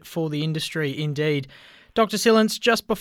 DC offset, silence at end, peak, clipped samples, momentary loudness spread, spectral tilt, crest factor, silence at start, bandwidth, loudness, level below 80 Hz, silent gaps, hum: under 0.1%; 0 s; -6 dBFS; under 0.1%; 10 LU; -4.5 dB/octave; 18 dB; 0.05 s; 18 kHz; -22 LUFS; -58 dBFS; none; none